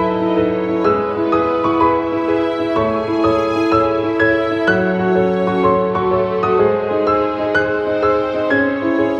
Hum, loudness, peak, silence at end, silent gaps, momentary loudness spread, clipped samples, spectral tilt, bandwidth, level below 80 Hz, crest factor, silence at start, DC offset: none; -16 LUFS; -2 dBFS; 0 s; none; 3 LU; under 0.1%; -7.5 dB/octave; 7 kHz; -44 dBFS; 14 dB; 0 s; under 0.1%